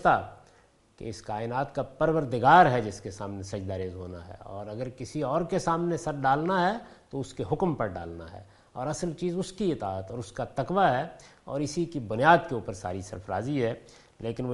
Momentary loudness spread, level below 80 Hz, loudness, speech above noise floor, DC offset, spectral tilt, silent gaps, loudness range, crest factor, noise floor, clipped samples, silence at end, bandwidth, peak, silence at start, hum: 17 LU; -54 dBFS; -28 LUFS; 33 dB; under 0.1%; -6 dB/octave; none; 6 LU; 24 dB; -61 dBFS; under 0.1%; 0 s; 11.5 kHz; -4 dBFS; 0 s; none